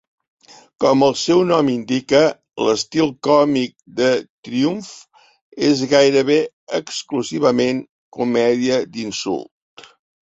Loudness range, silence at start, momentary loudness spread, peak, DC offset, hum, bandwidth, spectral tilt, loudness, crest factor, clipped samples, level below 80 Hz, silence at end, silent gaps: 4 LU; 0.8 s; 11 LU; -2 dBFS; under 0.1%; none; 8 kHz; -4.5 dB/octave; -18 LUFS; 18 dB; under 0.1%; -60 dBFS; 0.85 s; 4.29-4.43 s, 5.42-5.52 s, 6.53-6.67 s, 7.89-8.12 s